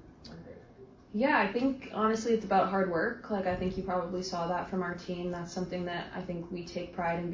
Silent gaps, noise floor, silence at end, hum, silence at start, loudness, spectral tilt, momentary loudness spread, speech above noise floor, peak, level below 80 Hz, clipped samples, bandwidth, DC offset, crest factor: none; -54 dBFS; 0 s; none; 0 s; -32 LUFS; -6 dB/octave; 12 LU; 22 dB; -12 dBFS; -56 dBFS; under 0.1%; 7.6 kHz; under 0.1%; 20 dB